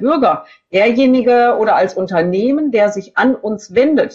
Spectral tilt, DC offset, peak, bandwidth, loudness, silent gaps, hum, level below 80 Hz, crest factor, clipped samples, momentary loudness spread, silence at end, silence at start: -6 dB/octave; under 0.1%; -2 dBFS; 7.8 kHz; -14 LUFS; none; none; -56 dBFS; 12 dB; under 0.1%; 6 LU; 0 s; 0 s